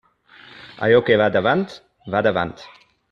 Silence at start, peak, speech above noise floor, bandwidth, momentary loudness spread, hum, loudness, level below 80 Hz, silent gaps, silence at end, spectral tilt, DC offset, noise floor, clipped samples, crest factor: 0.55 s; -2 dBFS; 30 dB; 7 kHz; 23 LU; none; -19 LUFS; -56 dBFS; none; 0.45 s; -7 dB/octave; under 0.1%; -48 dBFS; under 0.1%; 18 dB